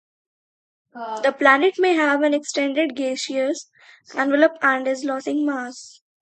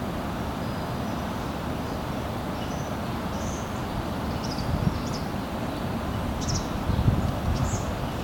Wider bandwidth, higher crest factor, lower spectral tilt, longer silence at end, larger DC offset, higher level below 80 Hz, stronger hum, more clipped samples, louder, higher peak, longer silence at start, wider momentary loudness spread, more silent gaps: second, 9.2 kHz vs 18 kHz; about the same, 22 dB vs 20 dB; second, -2 dB/octave vs -6 dB/octave; first, 0.35 s vs 0 s; neither; second, -76 dBFS vs -38 dBFS; neither; neither; first, -20 LUFS vs -29 LUFS; first, 0 dBFS vs -8 dBFS; first, 0.95 s vs 0 s; first, 15 LU vs 4 LU; neither